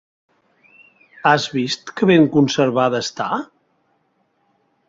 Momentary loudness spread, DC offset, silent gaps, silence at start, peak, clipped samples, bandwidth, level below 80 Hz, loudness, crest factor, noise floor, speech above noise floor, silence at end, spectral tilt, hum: 10 LU; under 0.1%; none; 1.25 s; -2 dBFS; under 0.1%; 7.8 kHz; -62 dBFS; -17 LUFS; 18 dB; -65 dBFS; 48 dB; 1.45 s; -5.5 dB/octave; none